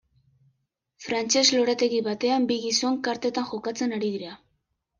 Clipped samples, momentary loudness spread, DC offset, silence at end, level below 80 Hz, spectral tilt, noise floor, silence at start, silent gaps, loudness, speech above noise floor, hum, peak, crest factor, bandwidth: under 0.1%; 11 LU; under 0.1%; 0.65 s; -70 dBFS; -2.5 dB/octave; -75 dBFS; 1 s; none; -24 LUFS; 51 dB; none; -6 dBFS; 20 dB; 10 kHz